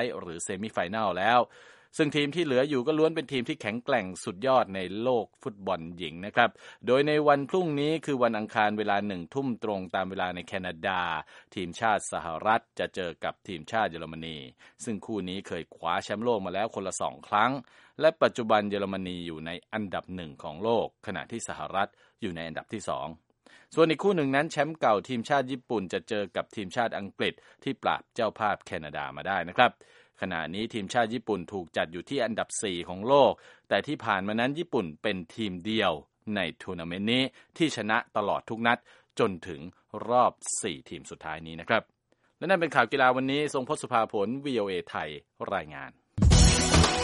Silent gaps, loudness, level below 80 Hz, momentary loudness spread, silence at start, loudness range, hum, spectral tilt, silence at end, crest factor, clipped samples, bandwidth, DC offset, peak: none; -29 LUFS; -42 dBFS; 13 LU; 0 s; 5 LU; none; -4.5 dB/octave; 0 s; 24 dB; under 0.1%; 11.5 kHz; under 0.1%; -4 dBFS